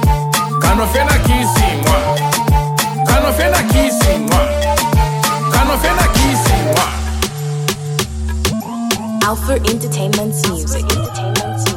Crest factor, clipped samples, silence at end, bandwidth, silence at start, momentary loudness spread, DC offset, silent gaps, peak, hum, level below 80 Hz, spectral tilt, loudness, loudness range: 14 dB; under 0.1%; 0 s; 17 kHz; 0 s; 6 LU; under 0.1%; none; 0 dBFS; none; -20 dBFS; -4.5 dB/octave; -14 LUFS; 4 LU